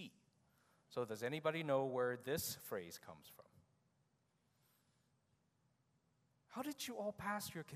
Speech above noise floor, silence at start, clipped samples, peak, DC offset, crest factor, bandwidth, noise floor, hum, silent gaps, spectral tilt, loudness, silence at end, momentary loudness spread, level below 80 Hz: 38 dB; 0 s; under 0.1%; -24 dBFS; under 0.1%; 22 dB; 15.5 kHz; -81 dBFS; none; none; -4 dB/octave; -43 LUFS; 0 s; 17 LU; -82 dBFS